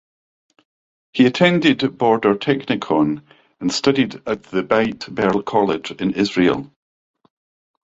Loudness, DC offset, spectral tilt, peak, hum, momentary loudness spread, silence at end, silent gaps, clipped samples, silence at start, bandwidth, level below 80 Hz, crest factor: -18 LUFS; under 0.1%; -5.5 dB/octave; -2 dBFS; none; 9 LU; 1.15 s; none; under 0.1%; 1.15 s; 8 kHz; -56 dBFS; 18 dB